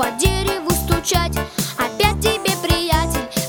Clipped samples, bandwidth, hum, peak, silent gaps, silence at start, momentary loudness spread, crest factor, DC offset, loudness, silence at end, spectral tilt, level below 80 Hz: under 0.1%; over 20 kHz; none; 0 dBFS; none; 0 s; 5 LU; 18 dB; under 0.1%; -19 LUFS; 0 s; -4 dB/octave; -28 dBFS